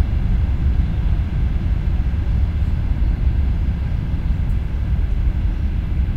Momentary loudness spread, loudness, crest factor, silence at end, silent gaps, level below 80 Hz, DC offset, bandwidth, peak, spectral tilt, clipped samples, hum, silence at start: 3 LU; -21 LUFS; 12 dB; 0 s; none; -20 dBFS; under 0.1%; 5 kHz; -4 dBFS; -9 dB/octave; under 0.1%; none; 0 s